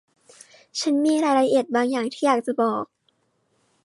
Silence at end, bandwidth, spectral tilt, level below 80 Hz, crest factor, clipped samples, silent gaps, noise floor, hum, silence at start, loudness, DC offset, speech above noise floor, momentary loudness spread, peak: 1 s; 11.5 kHz; -4 dB/octave; -78 dBFS; 18 dB; under 0.1%; none; -69 dBFS; none; 0.75 s; -22 LUFS; under 0.1%; 48 dB; 10 LU; -6 dBFS